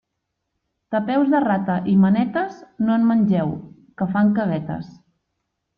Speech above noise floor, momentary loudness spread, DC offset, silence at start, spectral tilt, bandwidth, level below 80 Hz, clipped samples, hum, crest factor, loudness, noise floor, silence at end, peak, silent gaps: 59 dB; 12 LU; under 0.1%; 0.9 s; -10 dB/octave; 5.2 kHz; -58 dBFS; under 0.1%; none; 14 dB; -20 LUFS; -78 dBFS; 0.9 s; -6 dBFS; none